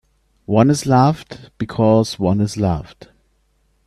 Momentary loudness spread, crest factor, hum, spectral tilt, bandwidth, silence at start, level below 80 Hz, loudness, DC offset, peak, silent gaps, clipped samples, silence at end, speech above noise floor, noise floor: 13 LU; 18 dB; none; -7 dB/octave; 13 kHz; 0.5 s; -44 dBFS; -17 LUFS; under 0.1%; 0 dBFS; none; under 0.1%; 1 s; 45 dB; -62 dBFS